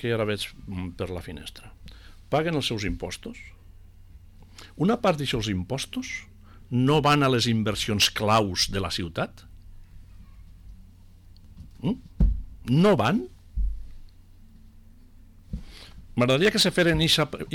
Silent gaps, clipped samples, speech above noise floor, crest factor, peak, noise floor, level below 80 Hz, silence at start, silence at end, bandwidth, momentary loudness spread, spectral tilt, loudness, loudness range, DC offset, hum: none; under 0.1%; 25 dB; 16 dB; -12 dBFS; -50 dBFS; -38 dBFS; 0 s; 0 s; 19 kHz; 20 LU; -4.5 dB/octave; -25 LUFS; 10 LU; under 0.1%; none